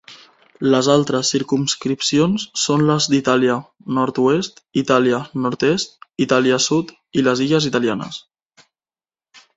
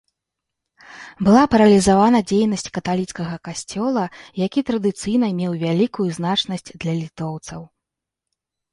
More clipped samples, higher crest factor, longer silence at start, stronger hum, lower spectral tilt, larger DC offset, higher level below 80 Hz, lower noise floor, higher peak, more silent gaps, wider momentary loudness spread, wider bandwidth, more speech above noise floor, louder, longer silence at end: neither; about the same, 18 dB vs 18 dB; second, 0.1 s vs 0.9 s; neither; about the same, -4.5 dB/octave vs -5.5 dB/octave; neither; second, -58 dBFS vs -50 dBFS; first, under -90 dBFS vs -84 dBFS; about the same, 0 dBFS vs -2 dBFS; neither; second, 8 LU vs 15 LU; second, 8 kHz vs 11.5 kHz; first, over 72 dB vs 65 dB; about the same, -18 LUFS vs -19 LUFS; first, 1.35 s vs 1.05 s